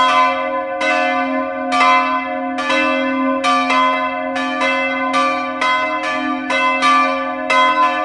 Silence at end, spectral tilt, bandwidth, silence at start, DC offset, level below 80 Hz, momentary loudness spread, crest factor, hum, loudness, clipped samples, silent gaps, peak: 0 s; -2.5 dB/octave; 11.5 kHz; 0 s; under 0.1%; -56 dBFS; 7 LU; 16 dB; none; -16 LUFS; under 0.1%; none; 0 dBFS